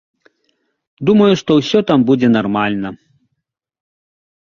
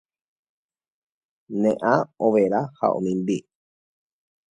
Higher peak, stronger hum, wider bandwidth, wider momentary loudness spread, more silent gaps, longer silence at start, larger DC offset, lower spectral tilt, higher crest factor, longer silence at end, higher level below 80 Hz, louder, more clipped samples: first, 0 dBFS vs -4 dBFS; neither; second, 7.2 kHz vs 10 kHz; about the same, 9 LU vs 7 LU; neither; second, 1 s vs 1.5 s; neither; about the same, -6.5 dB/octave vs -7.5 dB/octave; second, 16 dB vs 22 dB; first, 1.55 s vs 1.15 s; first, -54 dBFS vs -68 dBFS; first, -14 LUFS vs -23 LUFS; neither